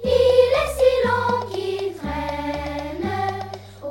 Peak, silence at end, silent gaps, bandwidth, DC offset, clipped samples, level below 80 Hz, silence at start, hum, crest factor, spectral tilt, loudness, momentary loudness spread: -4 dBFS; 0 s; none; 16 kHz; under 0.1%; under 0.1%; -40 dBFS; 0 s; none; 18 dB; -5.5 dB/octave; -21 LUFS; 12 LU